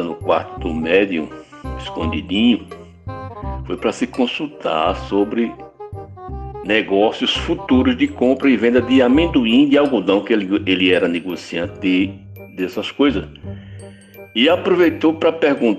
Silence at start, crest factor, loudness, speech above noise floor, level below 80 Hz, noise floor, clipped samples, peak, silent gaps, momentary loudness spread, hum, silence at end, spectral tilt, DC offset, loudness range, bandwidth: 0 s; 16 dB; -17 LUFS; 23 dB; -38 dBFS; -39 dBFS; under 0.1%; -2 dBFS; none; 19 LU; none; 0 s; -6 dB/octave; under 0.1%; 7 LU; 13 kHz